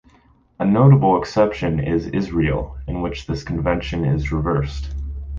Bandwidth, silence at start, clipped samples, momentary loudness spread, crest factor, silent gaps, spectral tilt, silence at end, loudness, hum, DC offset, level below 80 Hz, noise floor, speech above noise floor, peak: 7.2 kHz; 0.6 s; under 0.1%; 14 LU; 18 dB; none; -8.5 dB/octave; 0 s; -20 LUFS; none; under 0.1%; -32 dBFS; -55 dBFS; 36 dB; -2 dBFS